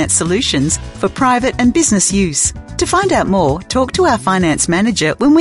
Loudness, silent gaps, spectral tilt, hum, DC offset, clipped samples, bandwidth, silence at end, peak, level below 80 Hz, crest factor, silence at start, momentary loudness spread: -13 LUFS; none; -4 dB/octave; none; 0.2%; under 0.1%; 11.5 kHz; 0 s; 0 dBFS; -32 dBFS; 12 dB; 0 s; 5 LU